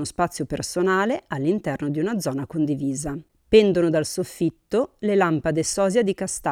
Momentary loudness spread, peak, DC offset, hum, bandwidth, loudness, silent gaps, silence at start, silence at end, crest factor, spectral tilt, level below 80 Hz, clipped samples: 9 LU; -4 dBFS; under 0.1%; none; 16 kHz; -23 LUFS; none; 0 s; 0 s; 18 dB; -5 dB/octave; -50 dBFS; under 0.1%